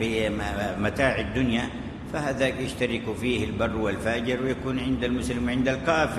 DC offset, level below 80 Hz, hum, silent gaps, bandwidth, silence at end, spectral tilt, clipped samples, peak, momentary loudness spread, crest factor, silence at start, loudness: under 0.1%; -40 dBFS; none; none; 13 kHz; 0 s; -5.5 dB/octave; under 0.1%; -10 dBFS; 4 LU; 16 dB; 0 s; -26 LUFS